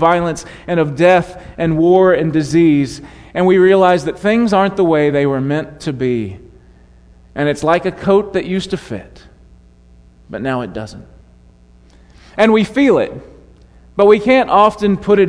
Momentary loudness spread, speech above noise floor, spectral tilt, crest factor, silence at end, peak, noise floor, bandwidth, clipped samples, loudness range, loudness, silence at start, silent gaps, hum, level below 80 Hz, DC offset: 16 LU; 32 dB; -6.5 dB/octave; 14 dB; 0 s; 0 dBFS; -45 dBFS; 10.5 kHz; under 0.1%; 11 LU; -14 LUFS; 0 s; none; none; -44 dBFS; under 0.1%